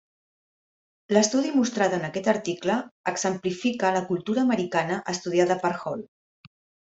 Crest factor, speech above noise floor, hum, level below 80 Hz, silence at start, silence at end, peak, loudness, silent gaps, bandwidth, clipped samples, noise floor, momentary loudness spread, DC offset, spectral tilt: 20 dB; over 65 dB; none; -68 dBFS; 1.1 s; 0.9 s; -6 dBFS; -25 LUFS; 2.91-3.04 s; 8.2 kHz; under 0.1%; under -90 dBFS; 6 LU; under 0.1%; -4.5 dB/octave